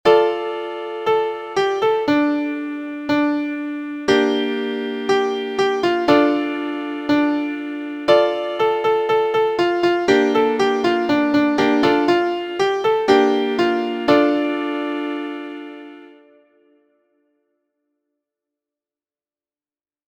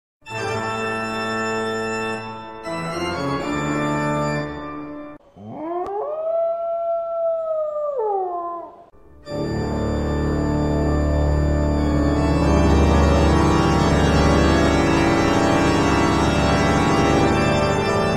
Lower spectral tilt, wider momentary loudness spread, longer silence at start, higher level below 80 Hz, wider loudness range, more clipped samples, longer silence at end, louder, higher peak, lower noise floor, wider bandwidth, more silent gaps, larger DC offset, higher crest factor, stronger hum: about the same, -5 dB/octave vs -6 dB/octave; second, 10 LU vs 13 LU; second, 0.05 s vs 0.25 s; second, -58 dBFS vs -28 dBFS; second, 5 LU vs 8 LU; neither; first, 4.05 s vs 0 s; about the same, -19 LUFS vs -20 LUFS; first, 0 dBFS vs -4 dBFS; first, under -90 dBFS vs -46 dBFS; second, 9.2 kHz vs 12 kHz; neither; second, under 0.1% vs 0.4%; about the same, 20 dB vs 16 dB; neither